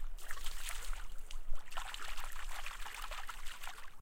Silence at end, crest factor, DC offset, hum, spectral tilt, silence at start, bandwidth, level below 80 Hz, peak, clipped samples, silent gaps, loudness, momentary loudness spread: 0 s; 14 dB; under 0.1%; none; -1 dB/octave; 0 s; 17 kHz; -42 dBFS; -22 dBFS; under 0.1%; none; -47 LUFS; 6 LU